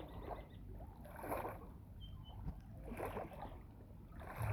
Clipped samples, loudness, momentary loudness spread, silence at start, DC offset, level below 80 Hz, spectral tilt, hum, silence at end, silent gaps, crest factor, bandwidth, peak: under 0.1%; -50 LUFS; 11 LU; 0 s; under 0.1%; -56 dBFS; -7 dB/octave; none; 0 s; none; 20 dB; over 20 kHz; -28 dBFS